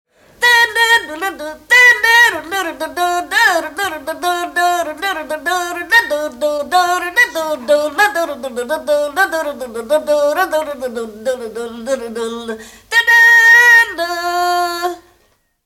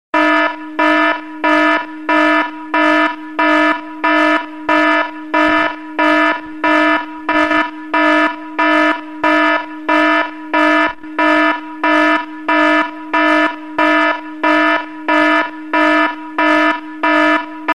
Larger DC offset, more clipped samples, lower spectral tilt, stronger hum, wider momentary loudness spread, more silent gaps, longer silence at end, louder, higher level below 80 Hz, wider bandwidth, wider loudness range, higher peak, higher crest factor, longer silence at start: second, under 0.1% vs 1%; neither; second, -0.5 dB/octave vs -3.5 dB/octave; neither; first, 16 LU vs 6 LU; neither; first, 0.65 s vs 0 s; about the same, -13 LUFS vs -14 LUFS; about the same, -54 dBFS vs -54 dBFS; first, 17 kHz vs 10.5 kHz; first, 7 LU vs 1 LU; about the same, 0 dBFS vs -2 dBFS; about the same, 14 dB vs 12 dB; first, 0.4 s vs 0.15 s